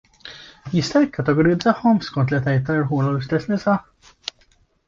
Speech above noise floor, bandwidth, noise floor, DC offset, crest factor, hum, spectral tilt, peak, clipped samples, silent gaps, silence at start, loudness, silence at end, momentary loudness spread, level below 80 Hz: 40 dB; 7.6 kHz; -59 dBFS; under 0.1%; 18 dB; none; -7 dB/octave; -2 dBFS; under 0.1%; none; 0.25 s; -20 LUFS; 1.05 s; 16 LU; -50 dBFS